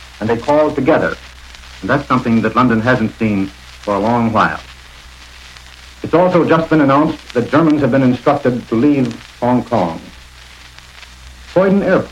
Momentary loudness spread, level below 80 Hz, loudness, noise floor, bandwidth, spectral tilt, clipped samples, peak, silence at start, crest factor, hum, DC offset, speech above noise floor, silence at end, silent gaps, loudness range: 17 LU; -40 dBFS; -14 LUFS; -38 dBFS; 12.5 kHz; -7.5 dB/octave; under 0.1%; 0 dBFS; 0 s; 16 dB; none; under 0.1%; 25 dB; 0 s; none; 5 LU